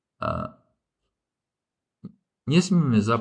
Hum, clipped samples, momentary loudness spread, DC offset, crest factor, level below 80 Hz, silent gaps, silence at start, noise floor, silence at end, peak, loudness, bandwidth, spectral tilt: none; under 0.1%; 16 LU; under 0.1%; 20 dB; -54 dBFS; none; 0.2 s; -88 dBFS; 0 s; -8 dBFS; -23 LUFS; 9.8 kHz; -6.5 dB/octave